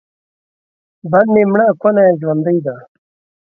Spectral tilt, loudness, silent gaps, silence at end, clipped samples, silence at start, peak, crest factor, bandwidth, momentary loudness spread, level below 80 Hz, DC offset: -12 dB/octave; -13 LUFS; none; 0.65 s; under 0.1%; 1.05 s; 0 dBFS; 14 dB; 3 kHz; 15 LU; -60 dBFS; under 0.1%